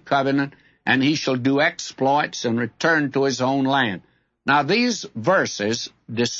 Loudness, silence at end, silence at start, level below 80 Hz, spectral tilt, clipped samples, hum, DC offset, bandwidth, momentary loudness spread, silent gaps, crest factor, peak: -21 LUFS; 0 s; 0.05 s; -64 dBFS; -4.5 dB/octave; under 0.1%; none; under 0.1%; 8 kHz; 7 LU; none; 16 dB; -6 dBFS